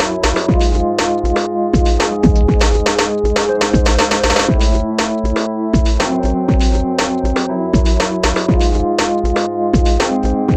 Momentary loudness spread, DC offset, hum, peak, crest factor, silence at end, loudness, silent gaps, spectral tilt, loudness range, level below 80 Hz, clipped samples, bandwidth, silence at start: 4 LU; under 0.1%; none; 0 dBFS; 14 dB; 0 s; -15 LUFS; none; -5.5 dB/octave; 2 LU; -18 dBFS; under 0.1%; 9.6 kHz; 0 s